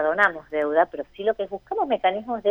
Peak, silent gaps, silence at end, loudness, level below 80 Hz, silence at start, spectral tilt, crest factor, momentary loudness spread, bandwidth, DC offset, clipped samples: -4 dBFS; none; 0 s; -24 LUFS; -60 dBFS; 0 s; -5.5 dB/octave; 18 dB; 7 LU; 8 kHz; under 0.1%; under 0.1%